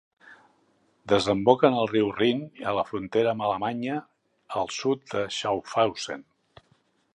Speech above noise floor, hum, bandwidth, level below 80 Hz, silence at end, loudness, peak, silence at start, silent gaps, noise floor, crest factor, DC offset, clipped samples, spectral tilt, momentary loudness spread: 41 dB; none; 11 kHz; -62 dBFS; 0.95 s; -26 LUFS; -2 dBFS; 0.3 s; none; -66 dBFS; 24 dB; under 0.1%; under 0.1%; -5 dB/octave; 11 LU